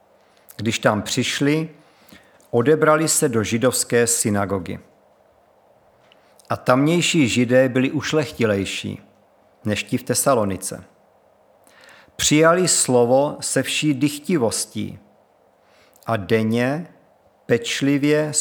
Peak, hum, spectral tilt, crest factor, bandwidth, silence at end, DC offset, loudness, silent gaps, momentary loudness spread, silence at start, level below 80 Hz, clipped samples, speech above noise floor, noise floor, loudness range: -2 dBFS; none; -4 dB/octave; 20 dB; over 20 kHz; 0 s; under 0.1%; -19 LUFS; none; 13 LU; 0.6 s; -60 dBFS; under 0.1%; 38 dB; -57 dBFS; 6 LU